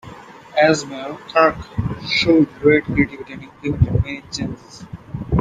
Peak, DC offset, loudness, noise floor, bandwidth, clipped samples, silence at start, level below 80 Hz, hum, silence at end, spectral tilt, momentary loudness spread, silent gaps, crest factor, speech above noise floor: -2 dBFS; under 0.1%; -18 LUFS; -39 dBFS; 9.6 kHz; under 0.1%; 0.05 s; -36 dBFS; none; 0 s; -6 dB/octave; 19 LU; none; 18 dB; 20 dB